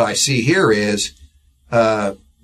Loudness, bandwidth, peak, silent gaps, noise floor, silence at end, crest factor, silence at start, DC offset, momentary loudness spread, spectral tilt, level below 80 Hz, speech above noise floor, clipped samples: -17 LUFS; 14 kHz; -2 dBFS; none; -49 dBFS; 0.3 s; 16 dB; 0 s; under 0.1%; 8 LU; -4 dB/octave; -48 dBFS; 32 dB; under 0.1%